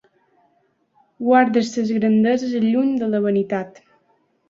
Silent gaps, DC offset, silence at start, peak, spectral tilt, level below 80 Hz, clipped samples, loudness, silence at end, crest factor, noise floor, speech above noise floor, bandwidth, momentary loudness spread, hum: none; under 0.1%; 1.2 s; -2 dBFS; -6.5 dB/octave; -66 dBFS; under 0.1%; -19 LUFS; 0.8 s; 18 dB; -64 dBFS; 46 dB; 7.6 kHz; 10 LU; none